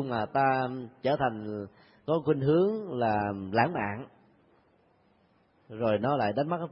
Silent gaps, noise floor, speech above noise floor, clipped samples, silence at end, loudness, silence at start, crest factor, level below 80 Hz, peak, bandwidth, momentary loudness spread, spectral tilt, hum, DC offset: none; -66 dBFS; 38 dB; under 0.1%; 0 s; -29 LUFS; 0 s; 20 dB; -64 dBFS; -10 dBFS; 5.8 kHz; 14 LU; -11 dB/octave; none; under 0.1%